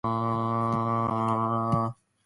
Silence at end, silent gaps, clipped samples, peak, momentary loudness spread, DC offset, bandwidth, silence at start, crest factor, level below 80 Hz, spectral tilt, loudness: 0.3 s; none; under 0.1%; -14 dBFS; 2 LU; under 0.1%; 11.5 kHz; 0.05 s; 14 dB; -56 dBFS; -9 dB/octave; -27 LUFS